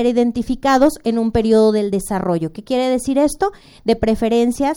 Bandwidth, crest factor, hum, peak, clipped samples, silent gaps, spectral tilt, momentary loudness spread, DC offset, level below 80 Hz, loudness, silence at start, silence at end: over 20 kHz; 14 dB; none; -2 dBFS; under 0.1%; none; -5.5 dB/octave; 8 LU; under 0.1%; -38 dBFS; -17 LUFS; 0 s; 0 s